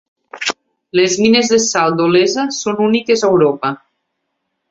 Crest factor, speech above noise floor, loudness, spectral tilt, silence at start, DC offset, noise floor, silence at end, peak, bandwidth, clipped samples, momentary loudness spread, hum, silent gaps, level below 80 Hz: 16 dB; 59 dB; -14 LUFS; -3.5 dB/octave; 0.35 s; under 0.1%; -72 dBFS; 0.95 s; 0 dBFS; 8 kHz; under 0.1%; 10 LU; none; none; -56 dBFS